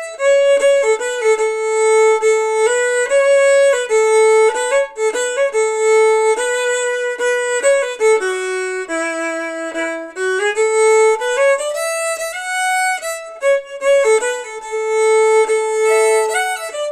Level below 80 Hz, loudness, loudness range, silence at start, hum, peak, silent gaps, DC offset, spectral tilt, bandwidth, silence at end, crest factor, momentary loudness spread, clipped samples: -64 dBFS; -15 LUFS; 4 LU; 0 s; none; -4 dBFS; none; under 0.1%; 1 dB/octave; 14 kHz; 0 s; 12 dB; 9 LU; under 0.1%